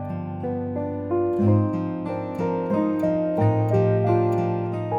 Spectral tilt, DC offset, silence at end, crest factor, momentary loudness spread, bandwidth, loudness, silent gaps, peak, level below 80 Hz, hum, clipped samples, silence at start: -10.5 dB/octave; under 0.1%; 0 s; 14 dB; 8 LU; 5 kHz; -23 LUFS; none; -8 dBFS; -56 dBFS; none; under 0.1%; 0 s